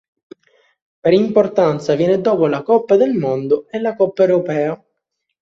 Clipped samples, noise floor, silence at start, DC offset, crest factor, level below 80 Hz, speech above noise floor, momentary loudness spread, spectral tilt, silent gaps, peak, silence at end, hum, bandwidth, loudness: under 0.1%; -75 dBFS; 1.05 s; under 0.1%; 14 dB; -60 dBFS; 60 dB; 7 LU; -7.5 dB/octave; none; -2 dBFS; 0.65 s; none; 7.8 kHz; -16 LUFS